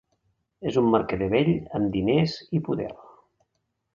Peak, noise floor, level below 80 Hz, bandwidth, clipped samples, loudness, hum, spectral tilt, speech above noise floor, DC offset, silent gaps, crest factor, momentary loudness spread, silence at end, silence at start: -6 dBFS; -77 dBFS; -52 dBFS; 7.4 kHz; under 0.1%; -25 LUFS; none; -8 dB/octave; 53 dB; under 0.1%; none; 20 dB; 9 LU; 1 s; 0.6 s